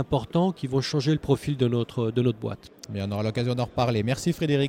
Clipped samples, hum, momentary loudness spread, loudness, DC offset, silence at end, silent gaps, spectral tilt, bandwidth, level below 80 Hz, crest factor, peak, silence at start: under 0.1%; none; 9 LU; -26 LUFS; under 0.1%; 0 s; none; -6.5 dB/octave; 16.5 kHz; -52 dBFS; 16 dB; -8 dBFS; 0 s